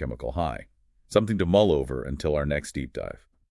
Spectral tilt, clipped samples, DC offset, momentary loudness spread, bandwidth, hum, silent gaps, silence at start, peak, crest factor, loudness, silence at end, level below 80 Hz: -6.5 dB/octave; under 0.1%; under 0.1%; 16 LU; 12 kHz; none; none; 0 s; -6 dBFS; 20 dB; -26 LUFS; 0.35 s; -42 dBFS